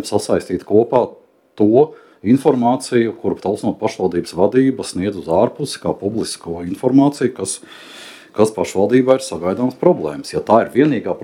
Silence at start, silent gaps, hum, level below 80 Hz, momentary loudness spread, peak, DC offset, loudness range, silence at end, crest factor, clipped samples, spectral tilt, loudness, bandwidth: 0 s; none; none; -56 dBFS; 11 LU; 0 dBFS; under 0.1%; 3 LU; 0 s; 16 dB; under 0.1%; -6 dB/octave; -17 LUFS; 15 kHz